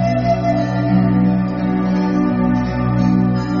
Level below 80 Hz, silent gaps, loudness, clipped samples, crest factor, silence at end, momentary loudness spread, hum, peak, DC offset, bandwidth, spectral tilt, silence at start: -34 dBFS; none; -16 LUFS; under 0.1%; 12 dB; 0 s; 3 LU; none; -4 dBFS; under 0.1%; 6.8 kHz; -8 dB/octave; 0 s